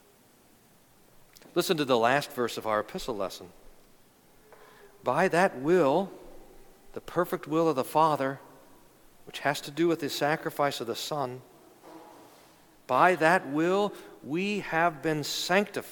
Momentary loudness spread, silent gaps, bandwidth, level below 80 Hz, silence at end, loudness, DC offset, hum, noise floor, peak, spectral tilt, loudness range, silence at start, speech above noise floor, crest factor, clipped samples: 11 LU; none; 19 kHz; -62 dBFS; 0 s; -28 LUFS; under 0.1%; none; -60 dBFS; -8 dBFS; -4.5 dB/octave; 4 LU; 1.55 s; 33 dB; 22 dB; under 0.1%